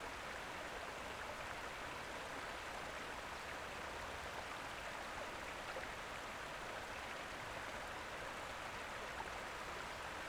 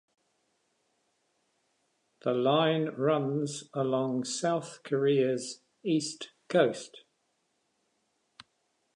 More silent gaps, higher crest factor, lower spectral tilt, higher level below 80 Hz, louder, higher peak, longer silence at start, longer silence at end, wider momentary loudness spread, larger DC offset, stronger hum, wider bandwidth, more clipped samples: neither; second, 16 dB vs 22 dB; second, -2.5 dB/octave vs -5 dB/octave; first, -64 dBFS vs -84 dBFS; second, -47 LUFS vs -30 LUFS; second, -32 dBFS vs -10 dBFS; second, 0 s vs 2.25 s; second, 0 s vs 1.95 s; second, 1 LU vs 12 LU; neither; neither; first, over 20 kHz vs 11 kHz; neither